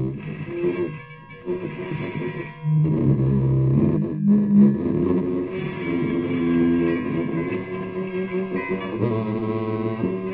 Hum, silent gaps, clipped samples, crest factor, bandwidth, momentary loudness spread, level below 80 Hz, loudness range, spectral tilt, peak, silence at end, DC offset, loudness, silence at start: none; none; under 0.1%; 16 dB; 4.2 kHz; 10 LU; -46 dBFS; 5 LU; -8.5 dB/octave; -6 dBFS; 0 s; under 0.1%; -23 LUFS; 0 s